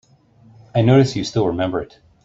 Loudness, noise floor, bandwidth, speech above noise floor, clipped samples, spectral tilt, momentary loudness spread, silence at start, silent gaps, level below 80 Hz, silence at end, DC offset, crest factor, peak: -18 LUFS; -51 dBFS; 7.8 kHz; 34 dB; under 0.1%; -7 dB/octave; 12 LU; 0.75 s; none; -50 dBFS; 0.4 s; under 0.1%; 18 dB; -2 dBFS